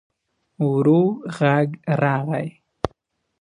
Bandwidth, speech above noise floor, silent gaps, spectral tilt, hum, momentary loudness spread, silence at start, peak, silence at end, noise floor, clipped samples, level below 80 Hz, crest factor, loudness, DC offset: 10.5 kHz; 46 dB; none; -8.5 dB/octave; none; 13 LU; 0.6 s; -2 dBFS; 0.55 s; -65 dBFS; under 0.1%; -52 dBFS; 20 dB; -21 LUFS; under 0.1%